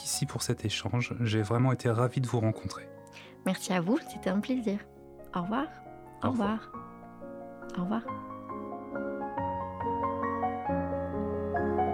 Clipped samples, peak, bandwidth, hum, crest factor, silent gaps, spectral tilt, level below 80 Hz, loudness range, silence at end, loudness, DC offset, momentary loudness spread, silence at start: under 0.1%; -14 dBFS; 17.5 kHz; none; 18 dB; none; -5.5 dB/octave; -56 dBFS; 6 LU; 0 s; -32 LUFS; under 0.1%; 16 LU; 0 s